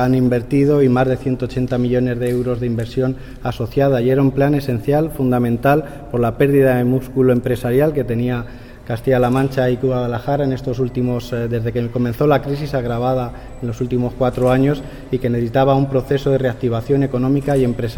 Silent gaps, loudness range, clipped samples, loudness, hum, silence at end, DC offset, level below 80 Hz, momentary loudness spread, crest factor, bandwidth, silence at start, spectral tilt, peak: none; 3 LU; under 0.1%; -18 LUFS; none; 0 s; under 0.1%; -36 dBFS; 7 LU; 14 dB; 17.5 kHz; 0 s; -8.5 dB/octave; -2 dBFS